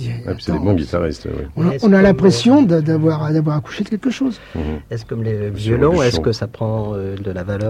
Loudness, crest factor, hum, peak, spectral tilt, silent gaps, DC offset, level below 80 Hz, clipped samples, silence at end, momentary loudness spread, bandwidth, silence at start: -17 LUFS; 14 dB; none; -2 dBFS; -7 dB/octave; none; under 0.1%; -36 dBFS; under 0.1%; 0 s; 13 LU; 11 kHz; 0 s